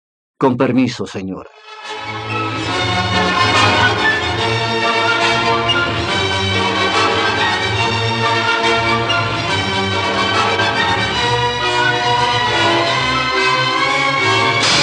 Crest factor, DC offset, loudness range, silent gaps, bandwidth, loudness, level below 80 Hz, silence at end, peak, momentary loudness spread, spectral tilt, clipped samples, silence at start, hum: 14 dB; under 0.1%; 2 LU; none; 11.5 kHz; -14 LUFS; -44 dBFS; 0 s; 0 dBFS; 7 LU; -4 dB/octave; under 0.1%; 0.4 s; none